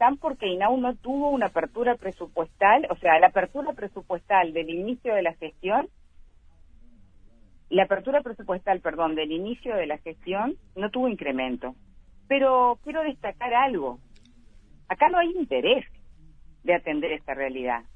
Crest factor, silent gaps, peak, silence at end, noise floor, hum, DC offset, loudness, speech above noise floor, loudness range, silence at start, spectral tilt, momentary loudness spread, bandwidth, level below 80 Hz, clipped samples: 22 dB; none; -4 dBFS; 0.15 s; -52 dBFS; none; under 0.1%; -25 LUFS; 28 dB; 6 LU; 0 s; -6.5 dB/octave; 12 LU; 7.4 kHz; -52 dBFS; under 0.1%